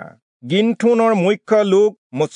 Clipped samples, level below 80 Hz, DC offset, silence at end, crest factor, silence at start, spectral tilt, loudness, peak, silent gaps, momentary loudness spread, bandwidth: under 0.1%; -74 dBFS; under 0.1%; 0.1 s; 12 dB; 0 s; -6.5 dB/octave; -16 LUFS; -4 dBFS; 0.22-0.40 s, 1.98-2.10 s; 5 LU; 10.5 kHz